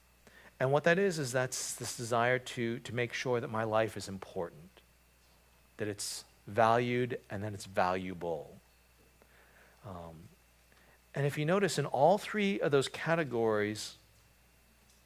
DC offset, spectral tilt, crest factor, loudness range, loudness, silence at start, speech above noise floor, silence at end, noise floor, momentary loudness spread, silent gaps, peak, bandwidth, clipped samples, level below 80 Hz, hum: under 0.1%; -5 dB/octave; 22 dB; 8 LU; -33 LUFS; 0.45 s; 33 dB; 1.1 s; -65 dBFS; 15 LU; none; -12 dBFS; 16 kHz; under 0.1%; -66 dBFS; none